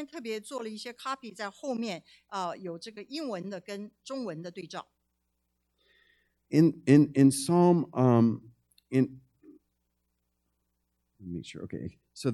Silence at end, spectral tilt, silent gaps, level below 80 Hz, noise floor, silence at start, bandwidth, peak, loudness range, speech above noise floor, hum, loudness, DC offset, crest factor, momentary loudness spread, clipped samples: 0 s; -6.5 dB/octave; none; -70 dBFS; -79 dBFS; 0 s; 13 kHz; -8 dBFS; 15 LU; 51 dB; 60 Hz at -60 dBFS; -28 LUFS; under 0.1%; 22 dB; 19 LU; under 0.1%